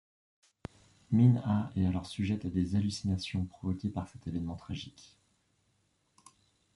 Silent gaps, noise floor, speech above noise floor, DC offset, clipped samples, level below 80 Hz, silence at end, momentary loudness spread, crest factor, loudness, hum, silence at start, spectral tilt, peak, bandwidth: none; -74 dBFS; 43 dB; under 0.1%; under 0.1%; -50 dBFS; 1.85 s; 20 LU; 20 dB; -32 LUFS; none; 1.1 s; -7.5 dB/octave; -14 dBFS; 11.5 kHz